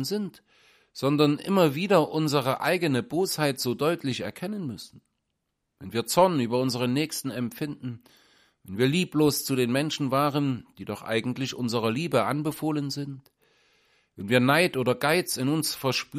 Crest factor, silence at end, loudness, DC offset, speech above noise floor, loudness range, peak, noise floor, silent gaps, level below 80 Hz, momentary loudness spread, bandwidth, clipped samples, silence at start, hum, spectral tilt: 20 dB; 0 s; -26 LUFS; under 0.1%; 54 dB; 4 LU; -6 dBFS; -80 dBFS; none; -66 dBFS; 14 LU; 15.5 kHz; under 0.1%; 0 s; none; -5 dB/octave